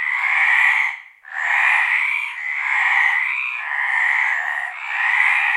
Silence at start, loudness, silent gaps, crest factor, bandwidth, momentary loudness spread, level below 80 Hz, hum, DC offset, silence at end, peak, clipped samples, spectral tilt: 0 s; -17 LUFS; none; 16 dB; 14.5 kHz; 9 LU; under -90 dBFS; none; under 0.1%; 0 s; -2 dBFS; under 0.1%; 4.5 dB/octave